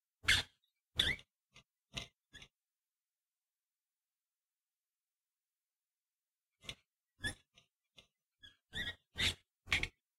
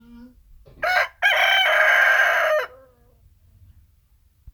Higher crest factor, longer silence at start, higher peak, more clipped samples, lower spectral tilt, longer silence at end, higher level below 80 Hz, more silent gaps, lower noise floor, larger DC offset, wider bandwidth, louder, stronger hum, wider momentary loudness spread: first, 28 dB vs 18 dB; about the same, 0.25 s vs 0.2 s; second, -16 dBFS vs -4 dBFS; neither; first, -1.5 dB/octave vs 0 dB/octave; first, 0.3 s vs 0.05 s; about the same, -60 dBFS vs -56 dBFS; first, 5.76-5.80 s, 6.15-6.22 s vs none; first, under -90 dBFS vs -59 dBFS; neither; second, 16 kHz vs over 20 kHz; second, -38 LUFS vs -17 LUFS; neither; first, 24 LU vs 10 LU